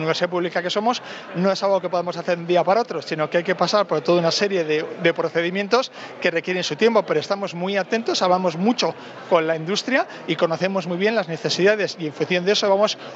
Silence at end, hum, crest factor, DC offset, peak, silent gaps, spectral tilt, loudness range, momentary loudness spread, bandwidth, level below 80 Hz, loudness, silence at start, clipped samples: 0 s; none; 18 dB; under 0.1%; -4 dBFS; none; -4.5 dB/octave; 1 LU; 6 LU; 8 kHz; -78 dBFS; -21 LUFS; 0 s; under 0.1%